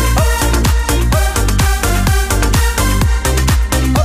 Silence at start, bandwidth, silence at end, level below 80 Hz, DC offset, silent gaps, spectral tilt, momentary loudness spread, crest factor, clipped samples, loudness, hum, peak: 0 s; 16.5 kHz; 0 s; -14 dBFS; under 0.1%; none; -4.5 dB/octave; 1 LU; 12 dB; under 0.1%; -14 LUFS; none; 0 dBFS